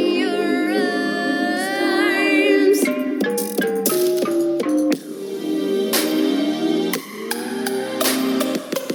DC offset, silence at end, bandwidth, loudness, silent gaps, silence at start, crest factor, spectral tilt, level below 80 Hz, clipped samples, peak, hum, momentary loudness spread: under 0.1%; 0 s; 19 kHz; -20 LUFS; none; 0 s; 16 dB; -3.5 dB/octave; -80 dBFS; under 0.1%; -2 dBFS; none; 8 LU